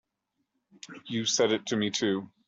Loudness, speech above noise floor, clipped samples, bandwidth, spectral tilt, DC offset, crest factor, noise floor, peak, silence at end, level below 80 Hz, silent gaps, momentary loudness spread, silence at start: -28 LUFS; 52 dB; under 0.1%; 8 kHz; -3 dB/octave; under 0.1%; 18 dB; -81 dBFS; -12 dBFS; 0.25 s; -72 dBFS; none; 16 LU; 0.85 s